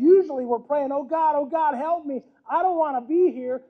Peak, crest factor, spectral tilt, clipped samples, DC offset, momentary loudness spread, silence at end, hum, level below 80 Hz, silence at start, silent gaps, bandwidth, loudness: -6 dBFS; 16 dB; -8 dB/octave; under 0.1%; under 0.1%; 7 LU; 0.1 s; none; -72 dBFS; 0 s; none; 4 kHz; -23 LUFS